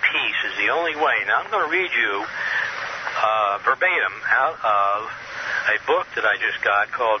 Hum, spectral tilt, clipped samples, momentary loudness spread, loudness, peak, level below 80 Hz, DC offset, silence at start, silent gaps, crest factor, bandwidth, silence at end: none; -2.5 dB/octave; under 0.1%; 6 LU; -20 LUFS; -4 dBFS; -62 dBFS; under 0.1%; 0 s; none; 16 dB; 6.6 kHz; 0 s